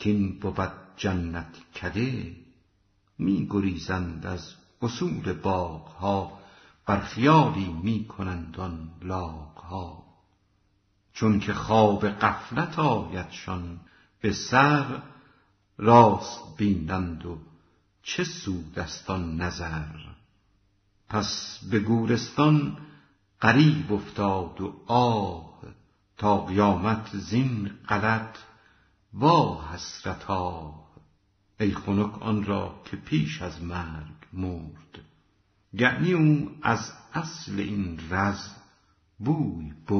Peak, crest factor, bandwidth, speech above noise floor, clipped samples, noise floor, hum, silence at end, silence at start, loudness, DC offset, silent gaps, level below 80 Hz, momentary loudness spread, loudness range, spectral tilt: -4 dBFS; 24 dB; 6.4 kHz; 42 dB; under 0.1%; -68 dBFS; none; 0 s; 0 s; -26 LUFS; under 0.1%; none; -50 dBFS; 17 LU; 8 LU; -5.5 dB/octave